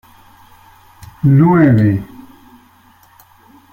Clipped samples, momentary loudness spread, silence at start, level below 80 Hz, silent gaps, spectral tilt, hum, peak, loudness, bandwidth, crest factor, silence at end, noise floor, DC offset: under 0.1%; 12 LU; 1.25 s; -48 dBFS; none; -10.5 dB/octave; none; 0 dBFS; -12 LUFS; 15.5 kHz; 16 dB; 1.7 s; -48 dBFS; under 0.1%